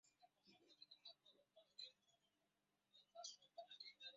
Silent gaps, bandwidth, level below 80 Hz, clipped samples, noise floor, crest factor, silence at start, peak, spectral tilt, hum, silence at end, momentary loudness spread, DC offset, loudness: none; 7.4 kHz; under -90 dBFS; under 0.1%; -89 dBFS; 22 dB; 0.05 s; -42 dBFS; 2 dB/octave; none; 0 s; 9 LU; under 0.1%; -61 LUFS